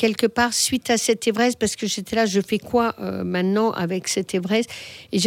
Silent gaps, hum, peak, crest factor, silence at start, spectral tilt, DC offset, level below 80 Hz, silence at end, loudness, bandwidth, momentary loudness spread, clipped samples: none; none; -4 dBFS; 16 dB; 0 s; -3.5 dB/octave; under 0.1%; -56 dBFS; 0 s; -22 LUFS; 17.5 kHz; 6 LU; under 0.1%